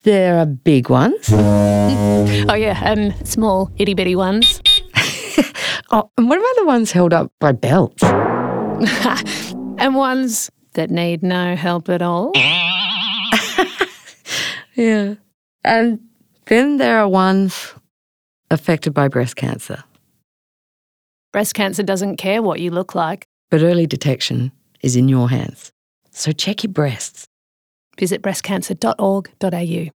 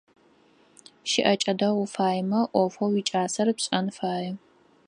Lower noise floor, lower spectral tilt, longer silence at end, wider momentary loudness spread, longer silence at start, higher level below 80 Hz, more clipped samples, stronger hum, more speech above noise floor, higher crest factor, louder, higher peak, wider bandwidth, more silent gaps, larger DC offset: first, under -90 dBFS vs -60 dBFS; about the same, -5 dB/octave vs -4.5 dB/octave; second, 0.05 s vs 0.5 s; about the same, 10 LU vs 8 LU; second, 0.05 s vs 1.05 s; first, -44 dBFS vs -74 dBFS; neither; neither; first, over 74 dB vs 35 dB; about the same, 16 dB vs 20 dB; first, -16 LUFS vs -25 LUFS; first, 0 dBFS vs -6 dBFS; first, 19 kHz vs 11 kHz; first, 7.32-7.38 s, 15.34-15.59 s, 17.90-18.43 s, 20.24-21.32 s, 23.25-23.48 s, 25.72-26.02 s, 27.27-27.91 s vs none; neither